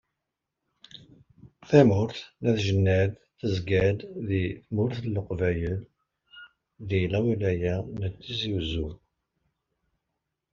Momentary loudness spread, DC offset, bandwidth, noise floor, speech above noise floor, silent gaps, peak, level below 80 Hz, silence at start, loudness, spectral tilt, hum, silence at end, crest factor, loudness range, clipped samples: 11 LU; under 0.1%; 7.2 kHz; -85 dBFS; 59 dB; none; -4 dBFS; -52 dBFS; 0.95 s; -27 LUFS; -6.5 dB/octave; none; 1.6 s; 24 dB; 5 LU; under 0.1%